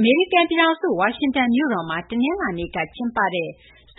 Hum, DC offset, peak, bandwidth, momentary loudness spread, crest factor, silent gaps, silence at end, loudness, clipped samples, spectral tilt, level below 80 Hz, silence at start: none; under 0.1%; -4 dBFS; 4.1 kHz; 9 LU; 16 dB; none; 0.45 s; -21 LUFS; under 0.1%; -10 dB/octave; -52 dBFS; 0 s